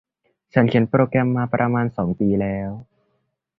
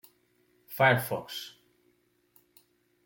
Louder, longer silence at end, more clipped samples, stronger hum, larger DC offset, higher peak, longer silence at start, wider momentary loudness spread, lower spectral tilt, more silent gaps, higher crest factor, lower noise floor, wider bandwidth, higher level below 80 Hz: first, -20 LUFS vs -28 LUFS; second, 0.75 s vs 1.55 s; neither; neither; neither; first, -2 dBFS vs -10 dBFS; second, 0.55 s vs 0.7 s; second, 9 LU vs 20 LU; first, -10.5 dB/octave vs -5 dB/octave; neither; second, 18 dB vs 24 dB; about the same, -71 dBFS vs -70 dBFS; second, 5.4 kHz vs 17 kHz; first, -50 dBFS vs -72 dBFS